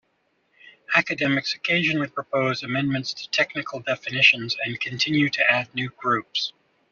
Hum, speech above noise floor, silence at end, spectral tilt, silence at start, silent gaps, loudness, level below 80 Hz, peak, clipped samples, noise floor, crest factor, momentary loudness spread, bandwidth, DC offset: none; 45 dB; 0.4 s; -2 dB/octave; 0.65 s; none; -22 LUFS; -66 dBFS; -4 dBFS; under 0.1%; -69 dBFS; 22 dB; 10 LU; 7.4 kHz; under 0.1%